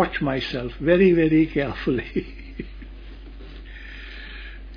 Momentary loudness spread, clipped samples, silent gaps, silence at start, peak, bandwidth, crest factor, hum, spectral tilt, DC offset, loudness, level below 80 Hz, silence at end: 25 LU; under 0.1%; none; 0 s; -6 dBFS; 5.2 kHz; 18 dB; none; -8.5 dB/octave; under 0.1%; -21 LUFS; -38 dBFS; 0 s